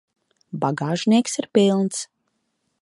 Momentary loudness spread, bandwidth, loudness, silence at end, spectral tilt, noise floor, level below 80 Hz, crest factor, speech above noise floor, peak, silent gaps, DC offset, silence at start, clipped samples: 14 LU; 11.5 kHz; -21 LUFS; 0.8 s; -5 dB/octave; -73 dBFS; -70 dBFS; 20 dB; 53 dB; -2 dBFS; none; under 0.1%; 0.55 s; under 0.1%